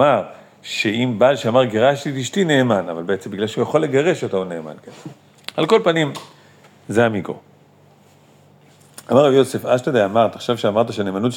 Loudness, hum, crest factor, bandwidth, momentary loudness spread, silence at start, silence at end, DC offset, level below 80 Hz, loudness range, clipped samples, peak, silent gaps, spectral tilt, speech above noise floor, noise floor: -18 LUFS; none; 18 dB; 17 kHz; 17 LU; 0 s; 0 s; under 0.1%; -68 dBFS; 4 LU; under 0.1%; -2 dBFS; none; -5.5 dB/octave; 33 dB; -51 dBFS